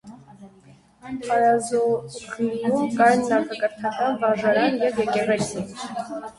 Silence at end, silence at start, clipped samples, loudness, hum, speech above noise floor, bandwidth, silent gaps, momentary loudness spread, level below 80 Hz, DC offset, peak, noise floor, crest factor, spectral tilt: 0.1 s; 0.05 s; under 0.1%; -22 LUFS; none; 30 dB; 11.5 kHz; none; 13 LU; -60 dBFS; under 0.1%; -4 dBFS; -52 dBFS; 18 dB; -5 dB/octave